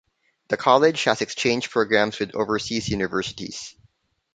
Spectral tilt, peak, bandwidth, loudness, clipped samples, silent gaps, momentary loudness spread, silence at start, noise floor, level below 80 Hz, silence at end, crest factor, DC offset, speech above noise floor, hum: -4 dB/octave; -2 dBFS; 9.4 kHz; -22 LUFS; under 0.1%; none; 15 LU; 0.5 s; -62 dBFS; -52 dBFS; 0.65 s; 22 dB; under 0.1%; 40 dB; none